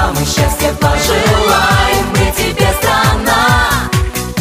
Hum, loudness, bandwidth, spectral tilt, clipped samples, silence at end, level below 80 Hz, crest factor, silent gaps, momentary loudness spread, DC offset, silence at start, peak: none; -12 LUFS; 16 kHz; -4 dB/octave; under 0.1%; 0 s; -20 dBFS; 12 dB; none; 4 LU; under 0.1%; 0 s; 0 dBFS